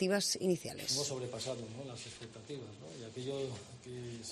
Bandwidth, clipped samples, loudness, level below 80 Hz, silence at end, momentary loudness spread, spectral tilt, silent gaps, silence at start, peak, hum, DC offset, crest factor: 13 kHz; under 0.1%; -39 LUFS; -72 dBFS; 0 s; 16 LU; -3.5 dB/octave; none; 0 s; -20 dBFS; none; under 0.1%; 20 dB